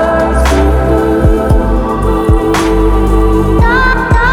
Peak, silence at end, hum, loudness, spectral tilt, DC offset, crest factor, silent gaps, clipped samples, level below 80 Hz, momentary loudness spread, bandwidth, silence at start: 0 dBFS; 0 s; none; -10 LUFS; -6.5 dB/octave; under 0.1%; 8 dB; none; under 0.1%; -12 dBFS; 2 LU; 14.5 kHz; 0 s